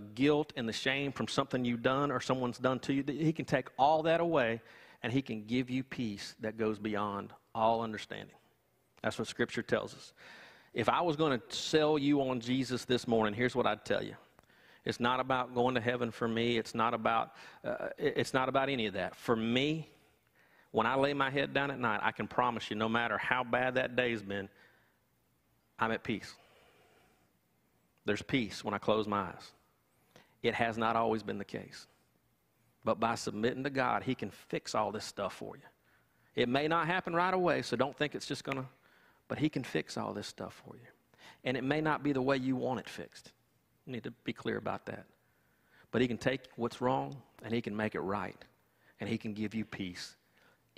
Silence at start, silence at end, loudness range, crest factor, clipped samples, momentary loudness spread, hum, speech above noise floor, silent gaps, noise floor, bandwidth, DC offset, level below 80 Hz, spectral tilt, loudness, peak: 0 s; 0.65 s; 6 LU; 24 dB; under 0.1%; 13 LU; none; 41 dB; none; -74 dBFS; 15.5 kHz; under 0.1%; -66 dBFS; -5.5 dB/octave; -34 LUFS; -10 dBFS